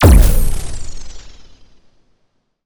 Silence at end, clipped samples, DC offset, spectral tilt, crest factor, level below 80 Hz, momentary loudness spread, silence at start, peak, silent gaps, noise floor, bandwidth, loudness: 0 s; under 0.1%; under 0.1%; -6 dB/octave; 14 dB; -16 dBFS; 27 LU; 0 s; 0 dBFS; none; -63 dBFS; over 20 kHz; -15 LUFS